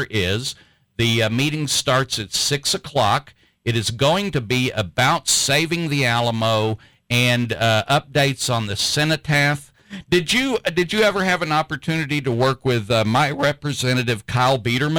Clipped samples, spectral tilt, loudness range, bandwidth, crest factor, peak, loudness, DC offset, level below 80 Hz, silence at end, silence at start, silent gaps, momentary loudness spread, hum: under 0.1%; -4 dB/octave; 1 LU; over 20 kHz; 12 dB; -8 dBFS; -19 LUFS; under 0.1%; -50 dBFS; 0 s; 0 s; none; 5 LU; none